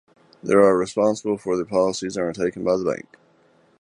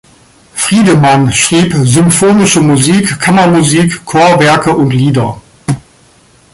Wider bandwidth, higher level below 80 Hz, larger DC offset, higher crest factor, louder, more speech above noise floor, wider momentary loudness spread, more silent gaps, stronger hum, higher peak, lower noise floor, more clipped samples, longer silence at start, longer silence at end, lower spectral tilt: about the same, 11 kHz vs 12 kHz; second, -58 dBFS vs -40 dBFS; neither; first, 20 dB vs 8 dB; second, -21 LUFS vs -8 LUFS; about the same, 37 dB vs 36 dB; about the same, 10 LU vs 12 LU; neither; neither; about the same, -2 dBFS vs 0 dBFS; first, -58 dBFS vs -44 dBFS; neither; about the same, 0.45 s vs 0.55 s; about the same, 0.85 s vs 0.75 s; about the same, -5.5 dB/octave vs -5 dB/octave